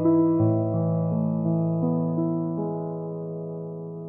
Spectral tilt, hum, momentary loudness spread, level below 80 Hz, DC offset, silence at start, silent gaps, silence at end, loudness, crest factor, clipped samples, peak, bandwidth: -16 dB/octave; none; 12 LU; -64 dBFS; under 0.1%; 0 s; none; 0 s; -26 LUFS; 14 dB; under 0.1%; -12 dBFS; 2.1 kHz